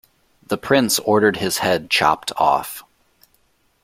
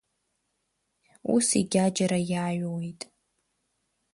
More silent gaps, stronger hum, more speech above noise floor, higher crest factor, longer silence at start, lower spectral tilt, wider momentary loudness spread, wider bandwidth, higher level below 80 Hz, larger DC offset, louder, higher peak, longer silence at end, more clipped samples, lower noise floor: neither; neither; second, 44 dB vs 52 dB; about the same, 18 dB vs 20 dB; second, 0.5 s vs 1.25 s; second, -3 dB/octave vs -5 dB/octave; second, 11 LU vs 15 LU; first, 16.5 kHz vs 11.5 kHz; first, -54 dBFS vs -66 dBFS; neither; first, -18 LUFS vs -26 LUFS; first, -2 dBFS vs -10 dBFS; second, 1.05 s vs 1.2 s; neither; second, -62 dBFS vs -78 dBFS